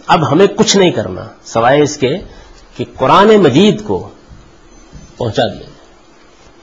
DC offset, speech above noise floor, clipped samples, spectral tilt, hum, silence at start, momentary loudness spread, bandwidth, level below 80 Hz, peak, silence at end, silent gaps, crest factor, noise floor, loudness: 0.4%; 33 dB; under 0.1%; -5 dB/octave; none; 0.05 s; 17 LU; 8 kHz; -42 dBFS; 0 dBFS; 1 s; none; 12 dB; -44 dBFS; -11 LUFS